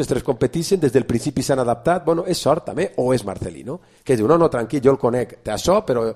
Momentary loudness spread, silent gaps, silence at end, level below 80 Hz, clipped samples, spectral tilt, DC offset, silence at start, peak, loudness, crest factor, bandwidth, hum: 10 LU; none; 0 s; -44 dBFS; under 0.1%; -6 dB/octave; under 0.1%; 0 s; -2 dBFS; -19 LUFS; 18 dB; 14.5 kHz; none